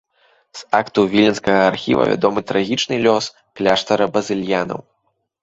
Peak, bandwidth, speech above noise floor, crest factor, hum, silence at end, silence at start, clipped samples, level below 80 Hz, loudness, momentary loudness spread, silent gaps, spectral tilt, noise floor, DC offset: -2 dBFS; 8 kHz; 52 dB; 18 dB; none; 0.6 s; 0.55 s; under 0.1%; -54 dBFS; -17 LUFS; 9 LU; none; -5 dB/octave; -69 dBFS; under 0.1%